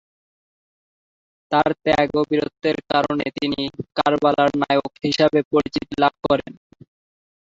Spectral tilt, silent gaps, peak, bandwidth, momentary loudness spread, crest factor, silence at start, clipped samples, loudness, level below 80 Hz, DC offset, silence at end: -6 dB/octave; 5.45-5.51 s; -2 dBFS; 7.8 kHz; 6 LU; 18 dB; 1.5 s; under 0.1%; -20 LUFS; -52 dBFS; under 0.1%; 1.05 s